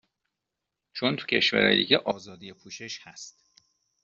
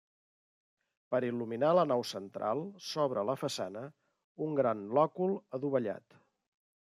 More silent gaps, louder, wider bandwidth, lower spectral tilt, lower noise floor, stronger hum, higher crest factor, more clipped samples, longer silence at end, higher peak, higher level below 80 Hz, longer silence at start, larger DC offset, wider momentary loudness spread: second, none vs 4.24-4.36 s; first, -24 LUFS vs -33 LUFS; second, 7.8 kHz vs 14.5 kHz; second, -4 dB/octave vs -6 dB/octave; second, -85 dBFS vs under -90 dBFS; neither; about the same, 24 dB vs 20 dB; neither; second, 0.75 s vs 0.9 s; first, -4 dBFS vs -14 dBFS; first, -68 dBFS vs -84 dBFS; second, 0.95 s vs 1.1 s; neither; first, 24 LU vs 12 LU